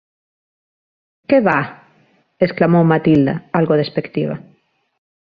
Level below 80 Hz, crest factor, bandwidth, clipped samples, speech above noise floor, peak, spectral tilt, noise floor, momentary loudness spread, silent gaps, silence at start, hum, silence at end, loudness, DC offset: -54 dBFS; 16 dB; 5 kHz; under 0.1%; 43 dB; -2 dBFS; -10 dB/octave; -57 dBFS; 11 LU; none; 1.3 s; none; 0.85 s; -16 LUFS; under 0.1%